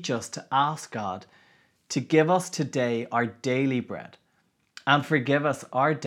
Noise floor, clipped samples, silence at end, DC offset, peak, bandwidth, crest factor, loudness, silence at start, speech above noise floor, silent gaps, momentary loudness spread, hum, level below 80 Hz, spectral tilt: -70 dBFS; under 0.1%; 0 s; under 0.1%; -4 dBFS; 14.5 kHz; 22 dB; -26 LUFS; 0 s; 44 dB; none; 11 LU; none; -78 dBFS; -5 dB/octave